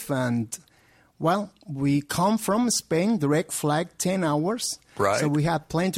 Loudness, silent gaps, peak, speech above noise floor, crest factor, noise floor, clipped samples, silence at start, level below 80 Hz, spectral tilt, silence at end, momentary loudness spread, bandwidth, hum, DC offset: -25 LUFS; none; -8 dBFS; 35 dB; 18 dB; -59 dBFS; under 0.1%; 0 s; -58 dBFS; -5 dB/octave; 0 s; 6 LU; 16.5 kHz; none; under 0.1%